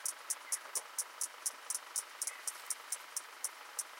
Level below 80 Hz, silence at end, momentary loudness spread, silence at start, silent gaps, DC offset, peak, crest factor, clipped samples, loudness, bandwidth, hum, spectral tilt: under -90 dBFS; 0 s; 5 LU; 0 s; none; under 0.1%; -18 dBFS; 24 dB; under 0.1%; -40 LUFS; 17 kHz; none; 5 dB/octave